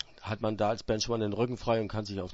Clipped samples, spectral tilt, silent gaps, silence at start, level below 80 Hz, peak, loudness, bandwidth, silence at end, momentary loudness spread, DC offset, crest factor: under 0.1%; -5.5 dB/octave; none; 0.1 s; -52 dBFS; -16 dBFS; -31 LUFS; 8 kHz; 0 s; 5 LU; under 0.1%; 16 dB